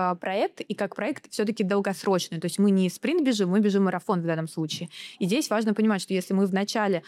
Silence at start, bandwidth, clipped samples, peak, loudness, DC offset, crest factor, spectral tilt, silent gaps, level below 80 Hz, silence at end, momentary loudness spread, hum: 0 s; 14.5 kHz; under 0.1%; -10 dBFS; -26 LUFS; under 0.1%; 14 dB; -5.5 dB/octave; none; -80 dBFS; 0.05 s; 8 LU; none